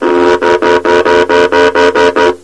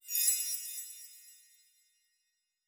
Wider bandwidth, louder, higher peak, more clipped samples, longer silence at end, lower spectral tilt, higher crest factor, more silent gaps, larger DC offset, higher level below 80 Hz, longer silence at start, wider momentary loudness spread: second, 11 kHz vs over 20 kHz; first, -8 LUFS vs -31 LUFS; first, 0 dBFS vs -14 dBFS; first, 2% vs under 0.1%; second, 0.05 s vs 1.3 s; first, -4 dB/octave vs 10 dB/octave; second, 8 dB vs 24 dB; neither; neither; first, -40 dBFS vs under -90 dBFS; about the same, 0 s vs 0.05 s; second, 2 LU vs 23 LU